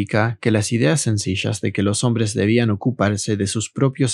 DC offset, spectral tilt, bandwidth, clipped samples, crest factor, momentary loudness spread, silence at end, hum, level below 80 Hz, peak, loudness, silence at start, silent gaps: under 0.1%; -5 dB/octave; 12.5 kHz; under 0.1%; 16 dB; 4 LU; 0 s; none; -62 dBFS; -2 dBFS; -19 LUFS; 0 s; none